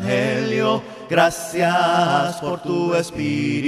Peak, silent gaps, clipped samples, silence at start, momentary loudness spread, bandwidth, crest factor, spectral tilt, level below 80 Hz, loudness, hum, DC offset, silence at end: -2 dBFS; none; under 0.1%; 0 s; 7 LU; 15 kHz; 18 dB; -5 dB/octave; -54 dBFS; -20 LUFS; none; under 0.1%; 0 s